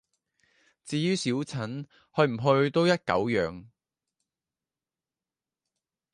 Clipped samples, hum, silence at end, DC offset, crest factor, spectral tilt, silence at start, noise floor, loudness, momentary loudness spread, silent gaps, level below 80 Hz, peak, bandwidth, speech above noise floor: under 0.1%; none; 2.5 s; under 0.1%; 22 dB; -6 dB/octave; 0.85 s; under -90 dBFS; -27 LUFS; 12 LU; none; -62 dBFS; -8 dBFS; 11.5 kHz; over 63 dB